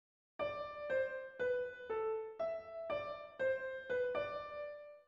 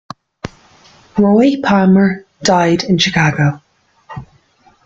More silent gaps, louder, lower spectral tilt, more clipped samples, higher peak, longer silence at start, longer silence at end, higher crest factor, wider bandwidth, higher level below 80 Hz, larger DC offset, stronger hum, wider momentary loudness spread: neither; second, -41 LUFS vs -13 LUFS; about the same, -5.5 dB/octave vs -5.5 dB/octave; neither; second, -28 dBFS vs 0 dBFS; about the same, 0.4 s vs 0.45 s; second, 0.05 s vs 0.6 s; about the same, 14 dB vs 14 dB; about the same, 7.2 kHz vs 7.6 kHz; second, -72 dBFS vs -48 dBFS; neither; neither; second, 7 LU vs 22 LU